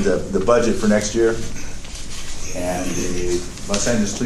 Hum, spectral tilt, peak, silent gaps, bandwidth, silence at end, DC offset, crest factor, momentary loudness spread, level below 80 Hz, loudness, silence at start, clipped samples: none; -4.5 dB/octave; -2 dBFS; none; 13 kHz; 0 s; under 0.1%; 18 dB; 15 LU; -30 dBFS; -20 LUFS; 0 s; under 0.1%